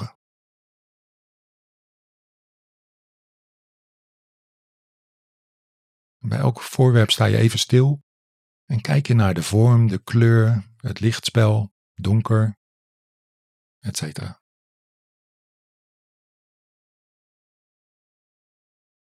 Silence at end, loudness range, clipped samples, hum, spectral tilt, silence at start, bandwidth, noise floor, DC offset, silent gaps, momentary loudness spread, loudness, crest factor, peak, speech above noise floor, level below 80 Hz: 4.7 s; 17 LU; under 0.1%; none; -6 dB/octave; 0 s; 14 kHz; under -90 dBFS; under 0.1%; 0.15-6.20 s, 8.03-8.68 s, 11.71-11.95 s, 12.57-13.81 s; 15 LU; -19 LUFS; 18 dB; -4 dBFS; over 72 dB; -66 dBFS